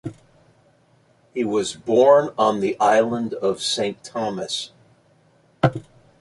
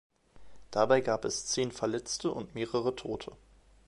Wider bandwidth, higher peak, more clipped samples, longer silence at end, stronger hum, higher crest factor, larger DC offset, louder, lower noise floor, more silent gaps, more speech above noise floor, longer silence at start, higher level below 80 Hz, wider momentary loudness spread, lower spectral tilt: about the same, 11.5 kHz vs 11.5 kHz; first, -2 dBFS vs -10 dBFS; neither; second, 0.4 s vs 0.55 s; neither; about the same, 20 dB vs 22 dB; neither; first, -21 LUFS vs -32 LUFS; first, -58 dBFS vs -52 dBFS; neither; first, 39 dB vs 20 dB; second, 0.05 s vs 0.35 s; about the same, -58 dBFS vs -60 dBFS; about the same, 13 LU vs 12 LU; first, -5 dB/octave vs -3.5 dB/octave